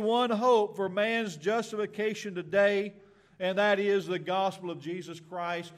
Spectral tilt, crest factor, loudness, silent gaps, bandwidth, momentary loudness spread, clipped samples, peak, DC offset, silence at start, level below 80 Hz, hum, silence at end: -5 dB/octave; 16 dB; -29 LUFS; none; 13.5 kHz; 13 LU; under 0.1%; -14 dBFS; under 0.1%; 0 s; -76 dBFS; none; 0 s